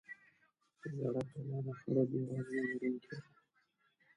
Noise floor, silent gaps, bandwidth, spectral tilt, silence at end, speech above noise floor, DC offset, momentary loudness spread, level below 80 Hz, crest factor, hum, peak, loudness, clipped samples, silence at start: -78 dBFS; none; 10.5 kHz; -9 dB/octave; 0.95 s; 39 dB; under 0.1%; 16 LU; -78 dBFS; 20 dB; none; -20 dBFS; -39 LUFS; under 0.1%; 0.1 s